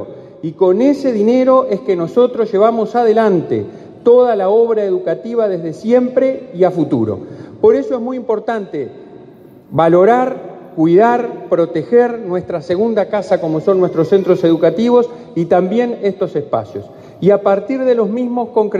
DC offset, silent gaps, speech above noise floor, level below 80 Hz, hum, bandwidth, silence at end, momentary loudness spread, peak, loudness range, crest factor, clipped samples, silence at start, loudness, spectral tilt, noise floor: under 0.1%; none; 26 dB; -58 dBFS; none; 7.6 kHz; 0 s; 10 LU; 0 dBFS; 3 LU; 14 dB; under 0.1%; 0 s; -14 LUFS; -8 dB/octave; -39 dBFS